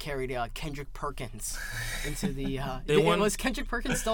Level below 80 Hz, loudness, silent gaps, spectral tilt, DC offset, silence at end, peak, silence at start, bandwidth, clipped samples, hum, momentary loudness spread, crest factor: -38 dBFS; -31 LUFS; none; -4 dB/octave; under 0.1%; 0 s; -10 dBFS; 0 s; 19 kHz; under 0.1%; none; 12 LU; 20 dB